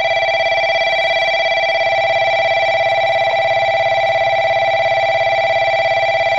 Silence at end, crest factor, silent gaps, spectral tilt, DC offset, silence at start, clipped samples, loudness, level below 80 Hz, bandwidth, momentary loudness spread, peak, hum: 0 s; 8 dB; none; -2.5 dB/octave; 0.4%; 0 s; under 0.1%; -14 LUFS; -54 dBFS; 7.4 kHz; 1 LU; -6 dBFS; none